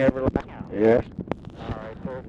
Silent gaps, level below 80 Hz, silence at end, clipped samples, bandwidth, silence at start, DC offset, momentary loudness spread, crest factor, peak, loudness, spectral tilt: none; -42 dBFS; 0 s; under 0.1%; 7.4 kHz; 0 s; under 0.1%; 14 LU; 16 dB; -8 dBFS; -26 LUFS; -9 dB/octave